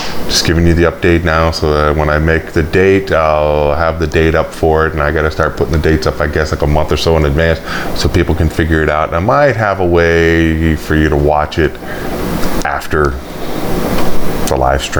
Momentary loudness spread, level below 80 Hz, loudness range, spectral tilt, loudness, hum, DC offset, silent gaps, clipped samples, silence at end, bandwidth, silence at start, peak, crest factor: 7 LU; -22 dBFS; 4 LU; -5.5 dB/octave; -12 LUFS; none; under 0.1%; none; under 0.1%; 0 s; over 20 kHz; 0 s; 0 dBFS; 12 dB